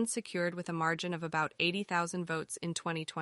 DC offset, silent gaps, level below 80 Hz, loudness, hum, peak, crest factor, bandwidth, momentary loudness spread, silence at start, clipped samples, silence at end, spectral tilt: under 0.1%; none; -76 dBFS; -34 LUFS; none; -18 dBFS; 18 dB; 11.5 kHz; 6 LU; 0 s; under 0.1%; 0 s; -4 dB/octave